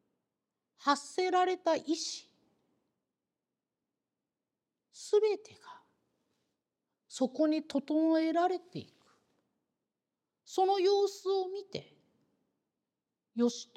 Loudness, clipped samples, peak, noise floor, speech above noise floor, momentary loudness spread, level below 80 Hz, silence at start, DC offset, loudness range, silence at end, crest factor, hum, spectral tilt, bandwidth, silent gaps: -32 LUFS; under 0.1%; -12 dBFS; under -90 dBFS; over 59 dB; 16 LU; -90 dBFS; 0.8 s; under 0.1%; 5 LU; 0.1 s; 22 dB; none; -3.5 dB/octave; 12 kHz; none